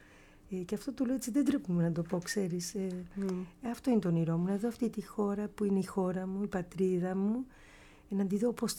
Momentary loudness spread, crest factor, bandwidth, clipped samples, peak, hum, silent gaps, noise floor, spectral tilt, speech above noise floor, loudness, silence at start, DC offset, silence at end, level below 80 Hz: 8 LU; 16 dB; 17 kHz; under 0.1%; -18 dBFS; none; none; -58 dBFS; -6.5 dB/octave; 25 dB; -34 LUFS; 0 s; under 0.1%; 0 s; -62 dBFS